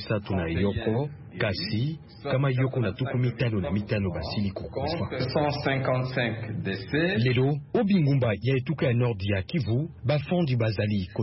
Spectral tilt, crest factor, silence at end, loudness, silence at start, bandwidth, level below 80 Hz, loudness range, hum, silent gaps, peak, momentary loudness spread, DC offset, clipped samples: -10.5 dB/octave; 14 dB; 0 s; -27 LUFS; 0 s; 5.8 kHz; -50 dBFS; 3 LU; none; none; -12 dBFS; 6 LU; under 0.1%; under 0.1%